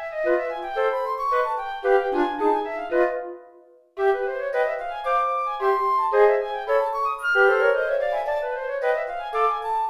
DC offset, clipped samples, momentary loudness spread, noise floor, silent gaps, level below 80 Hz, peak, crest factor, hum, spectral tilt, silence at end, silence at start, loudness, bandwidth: under 0.1%; under 0.1%; 8 LU; -52 dBFS; none; -56 dBFS; -6 dBFS; 18 dB; none; -4 dB/octave; 0 s; 0 s; -23 LUFS; 13.5 kHz